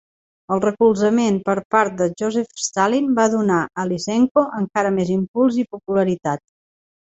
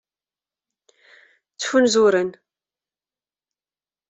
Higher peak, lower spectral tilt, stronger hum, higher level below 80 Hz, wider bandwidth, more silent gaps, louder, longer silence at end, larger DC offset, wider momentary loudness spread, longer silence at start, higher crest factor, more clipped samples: first, -2 dBFS vs -6 dBFS; first, -5.5 dB/octave vs -3.5 dB/octave; neither; first, -58 dBFS vs -66 dBFS; about the same, 8.2 kHz vs 8.2 kHz; first, 1.65-1.70 s, 4.31-4.35 s, 5.28-5.34 s vs none; about the same, -19 LUFS vs -19 LUFS; second, 0.8 s vs 1.75 s; neither; second, 7 LU vs 14 LU; second, 0.5 s vs 1.6 s; about the same, 18 dB vs 18 dB; neither